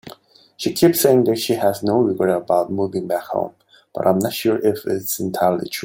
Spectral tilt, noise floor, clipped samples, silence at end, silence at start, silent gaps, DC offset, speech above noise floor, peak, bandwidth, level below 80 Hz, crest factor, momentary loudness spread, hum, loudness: -5 dB/octave; -46 dBFS; under 0.1%; 0 s; 0.05 s; none; under 0.1%; 28 dB; -2 dBFS; 17 kHz; -60 dBFS; 18 dB; 10 LU; none; -19 LUFS